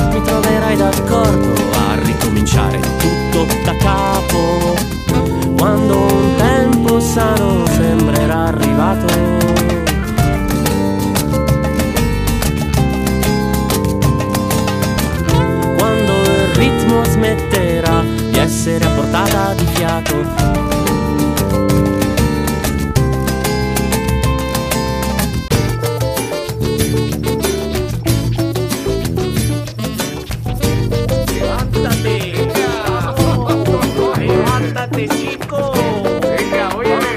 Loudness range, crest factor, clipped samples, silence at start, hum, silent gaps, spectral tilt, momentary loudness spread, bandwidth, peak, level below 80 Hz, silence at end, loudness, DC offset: 4 LU; 14 dB; under 0.1%; 0 s; none; none; -5.5 dB/octave; 5 LU; 15.5 kHz; 0 dBFS; -24 dBFS; 0 s; -15 LUFS; under 0.1%